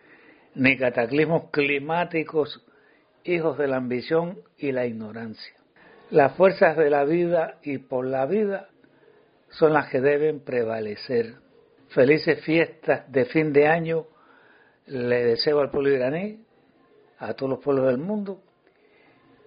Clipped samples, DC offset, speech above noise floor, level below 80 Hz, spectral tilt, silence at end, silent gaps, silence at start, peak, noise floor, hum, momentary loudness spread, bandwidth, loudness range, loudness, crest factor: under 0.1%; under 0.1%; 37 dB; -66 dBFS; -4.5 dB/octave; 1.1 s; none; 0.55 s; -4 dBFS; -60 dBFS; none; 15 LU; 5.4 kHz; 5 LU; -23 LUFS; 22 dB